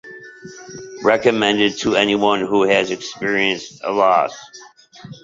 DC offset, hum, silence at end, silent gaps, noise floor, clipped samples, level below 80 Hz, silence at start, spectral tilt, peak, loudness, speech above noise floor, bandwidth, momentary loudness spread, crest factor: under 0.1%; none; 0.1 s; none; -39 dBFS; under 0.1%; -58 dBFS; 0.05 s; -4 dB/octave; -2 dBFS; -17 LUFS; 22 dB; 7.8 kHz; 21 LU; 18 dB